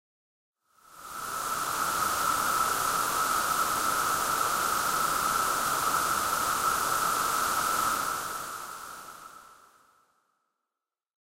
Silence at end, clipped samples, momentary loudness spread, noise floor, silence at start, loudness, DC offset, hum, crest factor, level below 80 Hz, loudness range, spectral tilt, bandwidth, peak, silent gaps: 1.85 s; under 0.1%; 12 LU; -89 dBFS; 0.9 s; -27 LUFS; under 0.1%; none; 16 dB; -58 dBFS; 6 LU; -1 dB/octave; 16 kHz; -14 dBFS; none